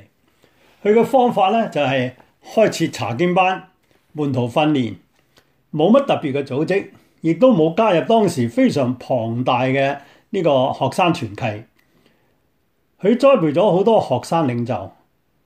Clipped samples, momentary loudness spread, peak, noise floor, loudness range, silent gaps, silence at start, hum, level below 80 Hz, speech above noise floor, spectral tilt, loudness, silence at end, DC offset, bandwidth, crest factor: under 0.1%; 12 LU; -2 dBFS; -66 dBFS; 3 LU; none; 0.85 s; none; -64 dBFS; 49 dB; -6.5 dB/octave; -18 LUFS; 0.55 s; under 0.1%; 15.5 kHz; 16 dB